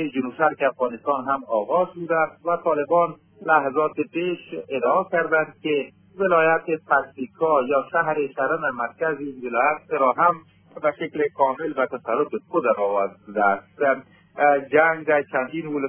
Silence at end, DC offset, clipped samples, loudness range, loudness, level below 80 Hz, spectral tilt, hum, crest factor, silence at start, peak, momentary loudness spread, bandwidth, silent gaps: 0 s; under 0.1%; under 0.1%; 2 LU; -22 LUFS; -70 dBFS; -9 dB/octave; none; 18 dB; 0 s; -4 dBFS; 8 LU; 3.5 kHz; none